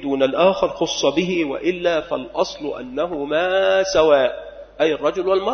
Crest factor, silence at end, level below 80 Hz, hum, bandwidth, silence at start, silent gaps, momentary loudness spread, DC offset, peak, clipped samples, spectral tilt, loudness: 16 dB; 0 s; -50 dBFS; none; 6.6 kHz; 0 s; none; 9 LU; under 0.1%; -2 dBFS; under 0.1%; -4 dB/octave; -19 LUFS